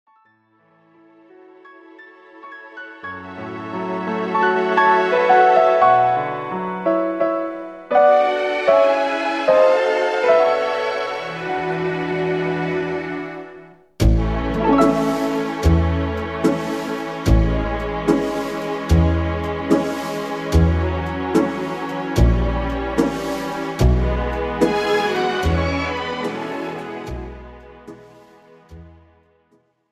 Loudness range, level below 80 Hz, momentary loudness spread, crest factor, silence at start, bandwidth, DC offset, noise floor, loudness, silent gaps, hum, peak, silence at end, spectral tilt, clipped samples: 10 LU; -28 dBFS; 14 LU; 16 dB; 1.65 s; 14.5 kHz; under 0.1%; -61 dBFS; -19 LUFS; none; none; -4 dBFS; 1.05 s; -6.5 dB/octave; under 0.1%